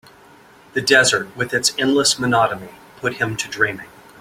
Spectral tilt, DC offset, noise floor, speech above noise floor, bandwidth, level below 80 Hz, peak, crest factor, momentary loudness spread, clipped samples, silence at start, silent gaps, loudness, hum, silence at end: -2.5 dB/octave; under 0.1%; -47 dBFS; 29 dB; 16.5 kHz; -56 dBFS; -2 dBFS; 20 dB; 13 LU; under 0.1%; 0.75 s; none; -18 LUFS; none; 0.35 s